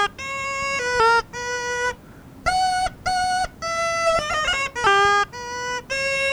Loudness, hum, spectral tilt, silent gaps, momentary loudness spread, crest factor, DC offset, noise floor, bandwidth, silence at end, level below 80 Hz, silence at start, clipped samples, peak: -21 LUFS; none; -1.5 dB/octave; none; 10 LU; 16 dB; under 0.1%; -43 dBFS; over 20 kHz; 0 s; -44 dBFS; 0 s; under 0.1%; -6 dBFS